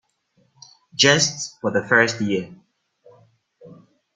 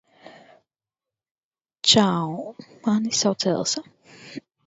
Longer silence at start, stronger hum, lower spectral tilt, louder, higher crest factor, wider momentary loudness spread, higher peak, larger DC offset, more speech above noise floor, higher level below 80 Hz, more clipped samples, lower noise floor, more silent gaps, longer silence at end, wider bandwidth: first, 1 s vs 0.25 s; neither; about the same, -2.5 dB/octave vs -3.5 dB/octave; about the same, -19 LUFS vs -21 LUFS; about the same, 22 dB vs 24 dB; second, 14 LU vs 22 LU; about the same, -2 dBFS vs -2 dBFS; neither; second, 45 dB vs 67 dB; about the same, -62 dBFS vs -64 dBFS; neither; second, -65 dBFS vs -90 dBFS; second, none vs 1.31-1.36 s, 1.44-1.51 s; first, 0.45 s vs 0.3 s; first, 11 kHz vs 8.2 kHz